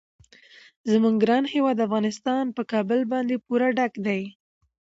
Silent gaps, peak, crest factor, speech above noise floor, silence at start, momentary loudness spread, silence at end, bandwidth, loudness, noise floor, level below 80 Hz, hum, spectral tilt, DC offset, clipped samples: none; -8 dBFS; 16 dB; 29 dB; 0.85 s; 7 LU; 0.65 s; 7.8 kHz; -24 LUFS; -52 dBFS; -70 dBFS; none; -6 dB/octave; under 0.1%; under 0.1%